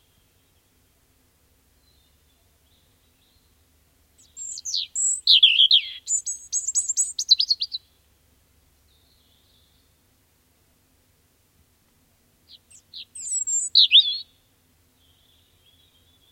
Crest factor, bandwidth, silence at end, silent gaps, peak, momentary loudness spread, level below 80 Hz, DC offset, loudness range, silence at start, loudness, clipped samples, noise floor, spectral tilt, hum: 22 dB; 16.5 kHz; 2.1 s; none; -4 dBFS; 22 LU; -68 dBFS; under 0.1%; 14 LU; 4.35 s; -18 LUFS; under 0.1%; -63 dBFS; 5 dB/octave; none